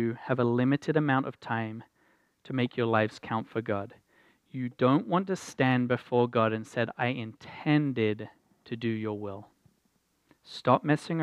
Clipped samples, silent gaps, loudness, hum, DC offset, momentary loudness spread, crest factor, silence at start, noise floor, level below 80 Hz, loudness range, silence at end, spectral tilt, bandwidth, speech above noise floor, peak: under 0.1%; none; -29 LUFS; none; under 0.1%; 13 LU; 22 dB; 0 s; -72 dBFS; -74 dBFS; 4 LU; 0 s; -7 dB/octave; 12 kHz; 44 dB; -8 dBFS